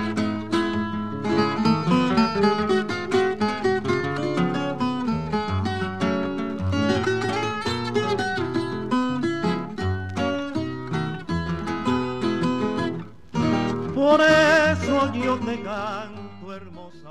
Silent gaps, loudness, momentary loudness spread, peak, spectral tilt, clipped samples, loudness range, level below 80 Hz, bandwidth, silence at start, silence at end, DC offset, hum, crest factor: none; -23 LUFS; 9 LU; -4 dBFS; -6 dB/octave; under 0.1%; 6 LU; -50 dBFS; 12 kHz; 0 s; 0 s; 0.6%; none; 18 dB